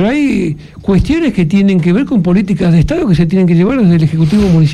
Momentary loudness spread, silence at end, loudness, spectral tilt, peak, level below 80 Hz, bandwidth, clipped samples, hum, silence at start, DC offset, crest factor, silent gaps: 4 LU; 0 s; -11 LUFS; -8.5 dB/octave; 0 dBFS; -28 dBFS; 10 kHz; under 0.1%; none; 0 s; under 0.1%; 10 dB; none